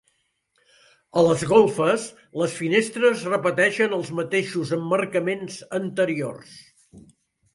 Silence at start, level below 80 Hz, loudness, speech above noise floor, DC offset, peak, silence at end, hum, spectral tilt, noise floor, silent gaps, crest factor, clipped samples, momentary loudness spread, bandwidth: 1.15 s; -64 dBFS; -22 LUFS; 48 dB; under 0.1%; -4 dBFS; 0.55 s; none; -5 dB/octave; -70 dBFS; none; 20 dB; under 0.1%; 11 LU; 11.5 kHz